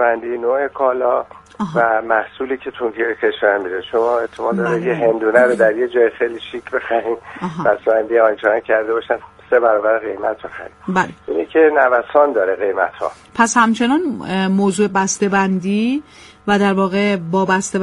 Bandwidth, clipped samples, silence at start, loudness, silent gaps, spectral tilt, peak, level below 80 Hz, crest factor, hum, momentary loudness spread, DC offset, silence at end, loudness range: 11.5 kHz; under 0.1%; 0 s; -17 LUFS; none; -5 dB/octave; 0 dBFS; -54 dBFS; 16 dB; none; 10 LU; under 0.1%; 0 s; 3 LU